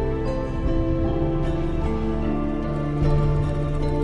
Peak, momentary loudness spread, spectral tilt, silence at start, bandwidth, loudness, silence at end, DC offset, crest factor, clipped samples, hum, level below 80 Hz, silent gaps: -8 dBFS; 4 LU; -9 dB/octave; 0 s; 7.2 kHz; -24 LUFS; 0 s; under 0.1%; 14 dB; under 0.1%; none; -26 dBFS; none